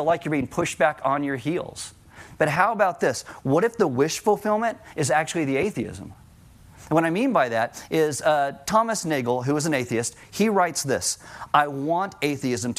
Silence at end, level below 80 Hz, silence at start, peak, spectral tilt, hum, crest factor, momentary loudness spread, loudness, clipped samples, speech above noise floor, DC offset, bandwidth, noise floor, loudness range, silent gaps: 0.05 s; -58 dBFS; 0 s; -2 dBFS; -4.5 dB/octave; none; 22 dB; 7 LU; -23 LUFS; under 0.1%; 26 dB; under 0.1%; 16 kHz; -50 dBFS; 2 LU; none